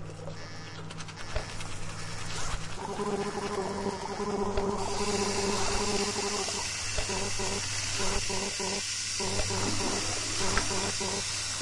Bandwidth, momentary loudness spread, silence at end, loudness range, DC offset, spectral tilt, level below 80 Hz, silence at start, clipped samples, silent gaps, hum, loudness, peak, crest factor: 11.5 kHz; 10 LU; 0 s; 6 LU; under 0.1%; -2.5 dB/octave; -42 dBFS; 0 s; under 0.1%; none; none; -31 LUFS; -10 dBFS; 20 dB